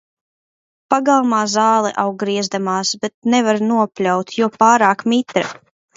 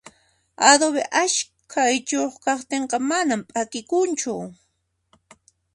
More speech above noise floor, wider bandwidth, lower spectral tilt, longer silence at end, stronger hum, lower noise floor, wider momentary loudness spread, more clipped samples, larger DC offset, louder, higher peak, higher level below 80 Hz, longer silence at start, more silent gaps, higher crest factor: first, over 74 dB vs 50 dB; second, 7.8 kHz vs 11.5 kHz; first, -4 dB/octave vs -1.5 dB/octave; second, 0.45 s vs 1.2 s; neither; first, under -90 dBFS vs -72 dBFS; second, 7 LU vs 12 LU; neither; neither; first, -16 LUFS vs -21 LUFS; about the same, 0 dBFS vs 0 dBFS; about the same, -66 dBFS vs -70 dBFS; first, 0.9 s vs 0.6 s; first, 3.14-3.22 s vs none; second, 16 dB vs 22 dB